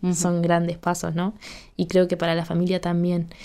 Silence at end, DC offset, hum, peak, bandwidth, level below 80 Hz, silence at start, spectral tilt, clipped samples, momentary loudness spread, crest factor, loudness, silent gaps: 0 s; under 0.1%; none; -8 dBFS; 13.5 kHz; -50 dBFS; 0 s; -6 dB/octave; under 0.1%; 9 LU; 16 dB; -23 LUFS; none